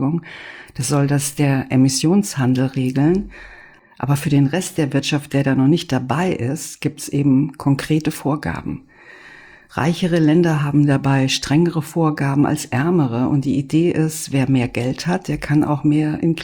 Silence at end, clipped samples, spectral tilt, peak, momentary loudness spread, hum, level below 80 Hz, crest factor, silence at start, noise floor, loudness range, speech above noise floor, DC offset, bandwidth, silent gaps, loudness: 0 s; under 0.1%; -6 dB/octave; -4 dBFS; 8 LU; none; -48 dBFS; 14 dB; 0 s; -43 dBFS; 3 LU; 25 dB; under 0.1%; over 20 kHz; none; -18 LUFS